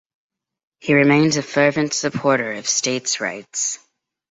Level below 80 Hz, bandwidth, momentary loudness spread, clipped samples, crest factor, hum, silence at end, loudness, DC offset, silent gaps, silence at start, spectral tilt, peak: -62 dBFS; 8.2 kHz; 9 LU; under 0.1%; 18 dB; none; 0.55 s; -18 LUFS; under 0.1%; none; 0.85 s; -3.5 dB/octave; -2 dBFS